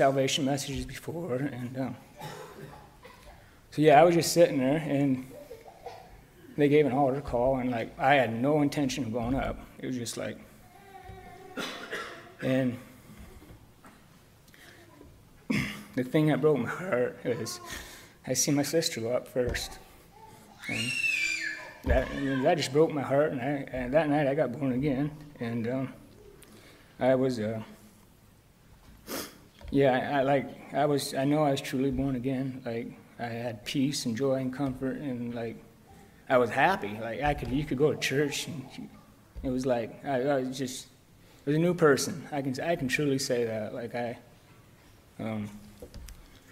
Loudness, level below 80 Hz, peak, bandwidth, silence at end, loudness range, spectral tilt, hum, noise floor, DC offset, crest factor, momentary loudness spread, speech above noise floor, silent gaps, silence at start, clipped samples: -29 LUFS; -50 dBFS; -8 dBFS; 16 kHz; 0.15 s; 10 LU; -5 dB/octave; none; -58 dBFS; under 0.1%; 22 dB; 19 LU; 31 dB; none; 0 s; under 0.1%